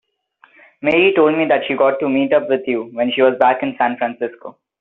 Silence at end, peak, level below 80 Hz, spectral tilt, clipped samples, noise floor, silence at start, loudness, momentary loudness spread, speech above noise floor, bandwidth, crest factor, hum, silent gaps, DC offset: 0.3 s; 0 dBFS; -62 dBFS; -2.5 dB/octave; under 0.1%; -54 dBFS; 0.8 s; -16 LUFS; 9 LU; 38 dB; 4.1 kHz; 16 dB; none; none; under 0.1%